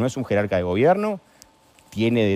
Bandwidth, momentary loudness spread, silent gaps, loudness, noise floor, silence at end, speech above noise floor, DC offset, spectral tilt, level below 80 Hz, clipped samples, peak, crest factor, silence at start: 15 kHz; 12 LU; none; -21 LUFS; -53 dBFS; 0 s; 33 dB; under 0.1%; -7 dB/octave; -54 dBFS; under 0.1%; -6 dBFS; 16 dB; 0 s